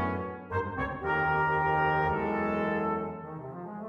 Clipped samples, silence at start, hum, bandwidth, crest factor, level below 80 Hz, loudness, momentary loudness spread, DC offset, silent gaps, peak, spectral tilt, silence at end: under 0.1%; 0 s; none; 7 kHz; 14 dB; -52 dBFS; -29 LUFS; 13 LU; under 0.1%; none; -16 dBFS; -8.5 dB/octave; 0 s